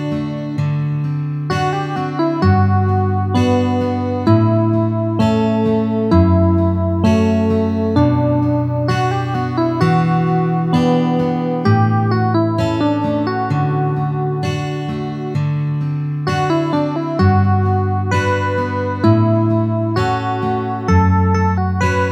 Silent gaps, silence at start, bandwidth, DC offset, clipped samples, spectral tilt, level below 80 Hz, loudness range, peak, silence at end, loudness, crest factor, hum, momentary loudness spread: none; 0 s; 8.6 kHz; under 0.1%; under 0.1%; -8 dB/octave; -40 dBFS; 4 LU; 0 dBFS; 0 s; -16 LUFS; 14 dB; none; 6 LU